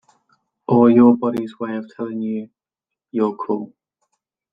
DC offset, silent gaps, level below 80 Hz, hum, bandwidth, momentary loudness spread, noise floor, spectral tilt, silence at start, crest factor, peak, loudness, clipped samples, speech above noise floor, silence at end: under 0.1%; none; -62 dBFS; none; 4.9 kHz; 16 LU; -86 dBFS; -10 dB/octave; 0.7 s; 18 dB; -2 dBFS; -19 LUFS; under 0.1%; 69 dB; 0.85 s